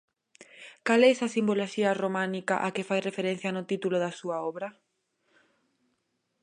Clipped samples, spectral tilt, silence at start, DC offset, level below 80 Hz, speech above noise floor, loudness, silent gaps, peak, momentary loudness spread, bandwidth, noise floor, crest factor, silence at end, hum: under 0.1%; -5 dB/octave; 0.4 s; under 0.1%; -80 dBFS; 50 dB; -28 LUFS; none; -10 dBFS; 13 LU; 10.5 kHz; -77 dBFS; 20 dB; 1.7 s; none